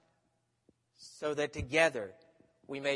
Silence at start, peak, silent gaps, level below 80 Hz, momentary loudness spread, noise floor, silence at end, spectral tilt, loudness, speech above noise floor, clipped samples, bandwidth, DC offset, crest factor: 1 s; -12 dBFS; none; -60 dBFS; 17 LU; -78 dBFS; 0 s; -4 dB/octave; -33 LUFS; 45 dB; under 0.1%; 11.5 kHz; under 0.1%; 24 dB